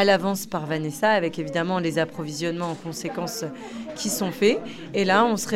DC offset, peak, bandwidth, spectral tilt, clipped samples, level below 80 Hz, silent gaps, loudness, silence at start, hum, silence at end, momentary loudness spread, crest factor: under 0.1%; -6 dBFS; 16.5 kHz; -4.5 dB/octave; under 0.1%; -60 dBFS; none; -25 LUFS; 0 s; none; 0 s; 11 LU; 18 dB